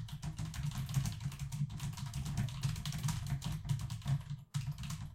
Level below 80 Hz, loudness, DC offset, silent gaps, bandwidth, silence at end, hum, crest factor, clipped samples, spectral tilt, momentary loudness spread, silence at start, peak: -50 dBFS; -40 LUFS; under 0.1%; none; 16.5 kHz; 0 s; none; 16 dB; under 0.1%; -5 dB/octave; 5 LU; 0 s; -22 dBFS